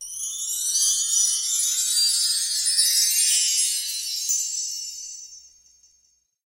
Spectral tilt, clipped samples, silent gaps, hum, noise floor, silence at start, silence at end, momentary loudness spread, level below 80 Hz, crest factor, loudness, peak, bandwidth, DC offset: 7 dB/octave; under 0.1%; none; none; -65 dBFS; 0 s; 1 s; 12 LU; -68 dBFS; 18 dB; -20 LUFS; -6 dBFS; 16 kHz; under 0.1%